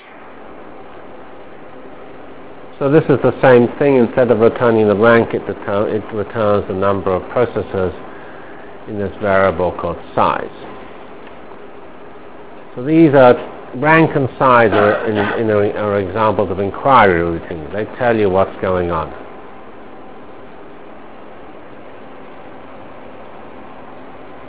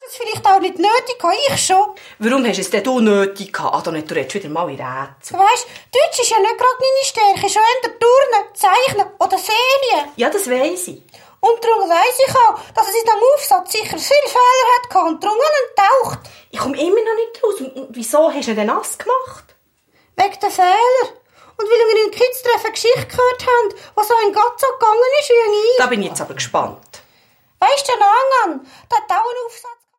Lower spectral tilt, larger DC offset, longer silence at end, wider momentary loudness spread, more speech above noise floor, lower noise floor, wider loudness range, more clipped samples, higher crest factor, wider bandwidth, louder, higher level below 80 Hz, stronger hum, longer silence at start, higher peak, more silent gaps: first, -11 dB/octave vs -2.5 dB/octave; first, 2% vs under 0.1%; second, 0 s vs 0.25 s; first, 26 LU vs 10 LU; second, 23 dB vs 43 dB; second, -37 dBFS vs -58 dBFS; first, 11 LU vs 4 LU; first, 0.1% vs under 0.1%; about the same, 16 dB vs 12 dB; second, 4 kHz vs 16.5 kHz; about the same, -14 LUFS vs -15 LUFS; first, -42 dBFS vs -58 dBFS; neither; about the same, 0 s vs 0 s; about the same, 0 dBFS vs -2 dBFS; neither